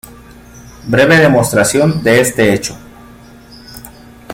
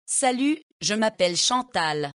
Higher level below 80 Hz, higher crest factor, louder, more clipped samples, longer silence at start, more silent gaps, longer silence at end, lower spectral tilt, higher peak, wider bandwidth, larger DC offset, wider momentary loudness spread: first, -42 dBFS vs -66 dBFS; about the same, 14 dB vs 14 dB; first, -10 LUFS vs -23 LUFS; neither; about the same, 0.1 s vs 0.1 s; second, none vs 0.63-0.80 s; about the same, 0 s vs 0.05 s; first, -4.5 dB/octave vs -2 dB/octave; first, 0 dBFS vs -10 dBFS; first, 17 kHz vs 11 kHz; neither; first, 24 LU vs 5 LU